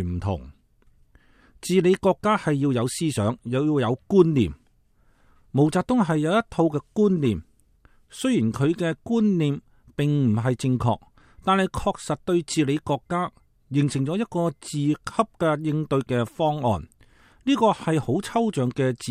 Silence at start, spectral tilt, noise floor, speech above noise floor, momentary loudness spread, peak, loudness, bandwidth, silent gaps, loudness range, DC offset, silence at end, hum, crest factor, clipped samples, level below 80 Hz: 0 s; -6.5 dB/octave; -60 dBFS; 38 dB; 7 LU; -4 dBFS; -24 LUFS; 14.5 kHz; none; 3 LU; under 0.1%; 0 s; none; 20 dB; under 0.1%; -50 dBFS